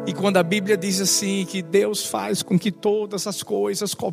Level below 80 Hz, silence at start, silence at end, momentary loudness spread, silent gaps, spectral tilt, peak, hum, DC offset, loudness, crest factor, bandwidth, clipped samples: -68 dBFS; 0 s; 0 s; 6 LU; none; -4 dB/octave; -4 dBFS; none; under 0.1%; -22 LUFS; 18 dB; 15.5 kHz; under 0.1%